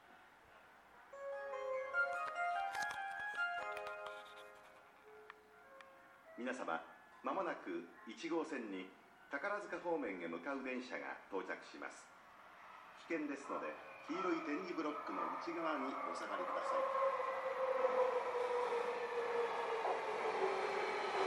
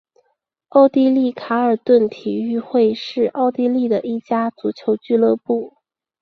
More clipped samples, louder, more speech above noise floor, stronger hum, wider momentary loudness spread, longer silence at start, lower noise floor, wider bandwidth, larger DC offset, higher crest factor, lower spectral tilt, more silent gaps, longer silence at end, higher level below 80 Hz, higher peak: neither; second, -42 LUFS vs -18 LUFS; second, 21 dB vs 52 dB; neither; first, 20 LU vs 9 LU; second, 0 s vs 0.75 s; second, -64 dBFS vs -69 dBFS; first, 14 kHz vs 6.2 kHz; neither; about the same, 18 dB vs 16 dB; second, -4 dB/octave vs -7.5 dB/octave; neither; second, 0 s vs 0.55 s; second, -84 dBFS vs -64 dBFS; second, -24 dBFS vs -2 dBFS